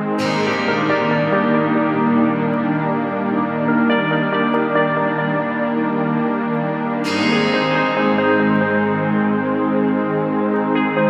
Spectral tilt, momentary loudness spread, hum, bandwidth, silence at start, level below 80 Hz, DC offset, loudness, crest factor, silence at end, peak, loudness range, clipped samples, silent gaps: -6.5 dB/octave; 4 LU; none; 9.8 kHz; 0 s; -64 dBFS; under 0.1%; -18 LUFS; 14 dB; 0 s; -4 dBFS; 1 LU; under 0.1%; none